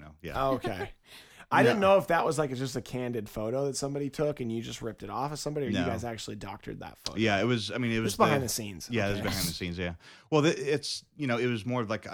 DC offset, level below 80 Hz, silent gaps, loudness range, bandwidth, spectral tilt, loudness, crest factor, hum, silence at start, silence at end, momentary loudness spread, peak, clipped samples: under 0.1%; -54 dBFS; none; 5 LU; over 20 kHz; -5 dB/octave; -30 LUFS; 22 dB; none; 0 s; 0 s; 14 LU; -8 dBFS; under 0.1%